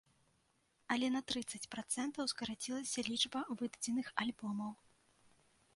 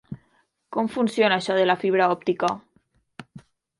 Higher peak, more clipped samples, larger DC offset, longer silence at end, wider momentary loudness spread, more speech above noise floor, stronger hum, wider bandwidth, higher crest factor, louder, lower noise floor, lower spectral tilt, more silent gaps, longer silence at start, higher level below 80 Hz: second, -18 dBFS vs -6 dBFS; neither; neither; first, 1 s vs 0.4 s; second, 8 LU vs 22 LU; second, 37 dB vs 45 dB; neither; about the same, 11.5 kHz vs 11.5 kHz; first, 24 dB vs 18 dB; second, -40 LUFS vs -22 LUFS; first, -77 dBFS vs -66 dBFS; second, -2.5 dB/octave vs -5.5 dB/octave; neither; first, 0.9 s vs 0.1 s; second, -76 dBFS vs -66 dBFS